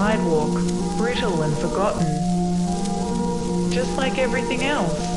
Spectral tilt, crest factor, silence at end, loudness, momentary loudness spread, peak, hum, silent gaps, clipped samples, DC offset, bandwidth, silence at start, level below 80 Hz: -5.5 dB/octave; 14 dB; 0 s; -22 LUFS; 3 LU; -6 dBFS; none; none; under 0.1%; under 0.1%; 11.5 kHz; 0 s; -36 dBFS